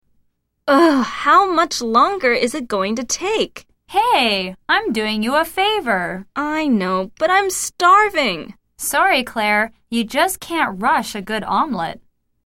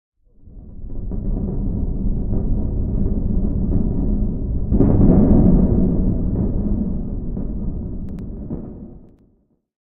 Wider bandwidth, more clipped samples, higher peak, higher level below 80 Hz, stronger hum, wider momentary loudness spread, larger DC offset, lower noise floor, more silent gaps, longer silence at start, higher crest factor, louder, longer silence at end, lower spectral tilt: first, 16.5 kHz vs 1.9 kHz; neither; about the same, -2 dBFS vs 0 dBFS; second, -52 dBFS vs -22 dBFS; neither; second, 10 LU vs 17 LU; neither; about the same, -64 dBFS vs -61 dBFS; neither; first, 0.65 s vs 0.45 s; about the same, 16 dB vs 18 dB; first, -17 LUFS vs -21 LUFS; second, 0.45 s vs 0.8 s; second, -3 dB/octave vs -15 dB/octave